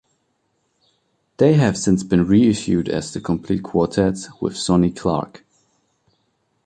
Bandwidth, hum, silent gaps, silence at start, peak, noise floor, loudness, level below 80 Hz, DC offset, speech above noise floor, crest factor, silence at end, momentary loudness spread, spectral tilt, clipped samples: 9.8 kHz; none; none; 1.4 s; -2 dBFS; -68 dBFS; -19 LUFS; -44 dBFS; under 0.1%; 51 dB; 18 dB; 1.4 s; 10 LU; -6.5 dB/octave; under 0.1%